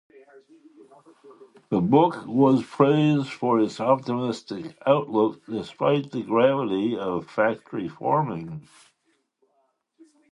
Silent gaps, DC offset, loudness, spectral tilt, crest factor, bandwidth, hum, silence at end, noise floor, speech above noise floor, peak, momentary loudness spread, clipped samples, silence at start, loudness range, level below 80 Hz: none; under 0.1%; -23 LUFS; -7.5 dB/octave; 20 dB; 11 kHz; none; 1.7 s; -71 dBFS; 47 dB; -4 dBFS; 13 LU; under 0.1%; 1.25 s; 6 LU; -64 dBFS